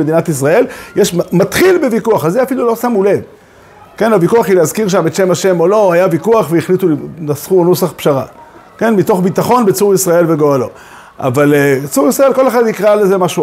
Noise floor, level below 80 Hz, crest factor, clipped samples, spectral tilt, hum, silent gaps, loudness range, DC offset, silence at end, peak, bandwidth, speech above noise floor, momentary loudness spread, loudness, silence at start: -39 dBFS; -50 dBFS; 12 dB; under 0.1%; -5.5 dB/octave; none; none; 2 LU; under 0.1%; 0 s; 0 dBFS; 16.5 kHz; 29 dB; 7 LU; -11 LUFS; 0 s